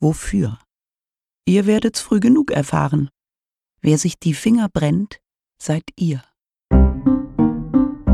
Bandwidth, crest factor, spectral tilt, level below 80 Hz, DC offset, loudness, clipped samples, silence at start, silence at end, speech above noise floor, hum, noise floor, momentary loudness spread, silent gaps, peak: 13 kHz; 16 dB; -6.5 dB/octave; -28 dBFS; under 0.1%; -18 LUFS; under 0.1%; 0 s; 0 s; over 73 dB; none; under -90 dBFS; 10 LU; none; -2 dBFS